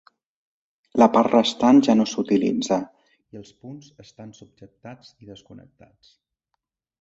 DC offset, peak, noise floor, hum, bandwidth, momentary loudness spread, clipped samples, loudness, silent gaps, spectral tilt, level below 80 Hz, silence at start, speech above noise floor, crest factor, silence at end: under 0.1%; -2 dBFS; -80 dBFS; none; 8 kHz; 27 LU; under 0.1%; -19 LUFS; none; -5.5 dB/octave; -64 dBFS; 0.95 s; 58 dB; 20 dB; 1.4 s